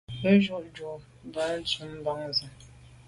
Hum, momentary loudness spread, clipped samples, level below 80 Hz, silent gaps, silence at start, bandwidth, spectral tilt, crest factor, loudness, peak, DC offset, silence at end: none; 18 LU; under 0.1%; -58 dBFS; none; 0.1 s; 11.5 kHz; -6 dB/octave; 20 dB; -28 LUFS; -8 dBFS; under 0.1%; 0.15 s